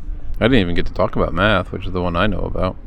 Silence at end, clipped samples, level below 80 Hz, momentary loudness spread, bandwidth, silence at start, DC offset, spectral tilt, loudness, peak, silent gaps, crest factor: 0 s; under 0.1%; -26 dBFS; 7 LU; 8.4 kHz; 0 s; under 0.1%; -7.5 dB/octave; -19 LUFS; 0 dBFS; none; 18 dB